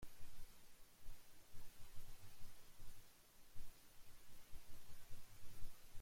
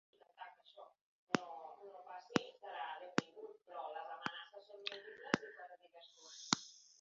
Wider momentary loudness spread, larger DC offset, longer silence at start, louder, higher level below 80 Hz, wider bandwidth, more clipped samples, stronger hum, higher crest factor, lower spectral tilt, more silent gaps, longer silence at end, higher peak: second, 4 LU vs 19 LU; neither; second, 0 s vs 0.35 s; second, -65 LUFS vs -44 LUFS; first, -60 dBFS vs -82 dBFS; first, 16.5 kHz vs 7.4 kHz; neither; neither; second, 14 dB vs 36 dB; about the same, -3.5 dB/octave vs -2.5 dB/octave; second, none vs 1.01-1.27 s; about the same, 0 s vs 0.05 s; second, -32 dBFS vs -10 dBFS